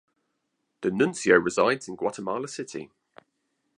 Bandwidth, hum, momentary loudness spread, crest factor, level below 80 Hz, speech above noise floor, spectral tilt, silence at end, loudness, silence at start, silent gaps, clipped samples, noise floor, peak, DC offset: 11 kHz; none; 15 LU; 22 dB; -66 dBFS; 52 dB; -4.5 dB/octave; 0.9 s; -25 LUFS; 0.8 s; none; under 0.1%; -78 dBFS; -4 dBFS; under 0.1%